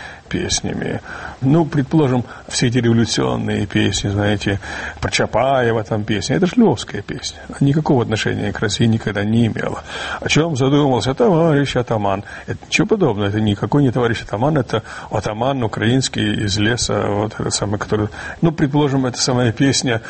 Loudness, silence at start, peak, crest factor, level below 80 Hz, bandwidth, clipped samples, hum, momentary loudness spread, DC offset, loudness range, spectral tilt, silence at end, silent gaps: -18 LUFS; 0 s; -2 dBFS; 16 dB; -40 dBFS; 8.8 kHz; under 0.1%; none; 9 LU; under 0.1%; 2 LU; -5 dB/octave; 0 s; none